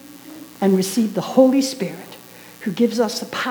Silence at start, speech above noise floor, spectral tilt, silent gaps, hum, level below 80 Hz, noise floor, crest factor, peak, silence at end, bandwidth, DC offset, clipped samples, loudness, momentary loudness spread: 0.05 s; 23 dB; -5 dB/octave; none; 60 Hz at -50 dBFS; -68 dBFS; -41 dBFS; 18 dB; -2 dBFS; 0 s; over 20 kHz; under 0.1%; under 0.1%; -19 LUFS; 23 LU